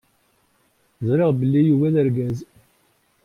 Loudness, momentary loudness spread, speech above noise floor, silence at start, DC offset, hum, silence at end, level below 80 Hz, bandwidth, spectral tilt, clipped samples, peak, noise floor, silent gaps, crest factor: -20 LUFS; 11 LU; 45 dB; 1 s; under 0.1%; none; 0.8 s; -58 dBFS; 9.8 kHz; -10 dB/octave; under 0.1%; -8 dBFS; -63 dBFS; none; 14 dB